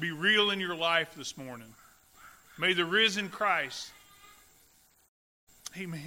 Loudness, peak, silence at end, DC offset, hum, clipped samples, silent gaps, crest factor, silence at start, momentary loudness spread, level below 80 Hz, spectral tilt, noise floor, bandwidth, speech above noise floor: -28 LUFS; -12 dBFS; 0 s; under 0.1%; none; under 0.1%; 5.08-5.47 s; 20 dB; 0 s; 20 LU; -72 dBFS; -3 dB/octave; -64 dBFS; 16 kHz; 34 dB